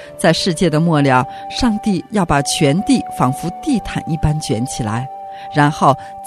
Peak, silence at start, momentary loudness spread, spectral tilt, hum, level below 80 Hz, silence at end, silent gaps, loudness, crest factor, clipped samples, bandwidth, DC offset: 0 dBFS; 0 s; 9 LU; -5.5 dB/octave; none; -36 dBFS; 0 s; none; -16 LUFS; 16 dB; under 0.1%; 14 kHz; under 0.1%